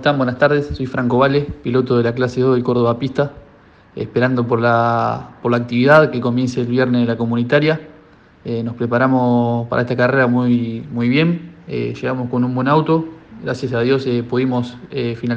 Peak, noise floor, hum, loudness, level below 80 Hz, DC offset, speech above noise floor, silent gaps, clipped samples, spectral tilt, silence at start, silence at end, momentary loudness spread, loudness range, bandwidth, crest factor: 0 dBFS; -47 dBFS; none; -17 LUFS; -48 dBFS; under 0.1%; 30 dB; none; under 0.1%; -8 dB/octave; 0 s; 0 s; 9 LU; 3 LU; 7.6 kHz; 16 dB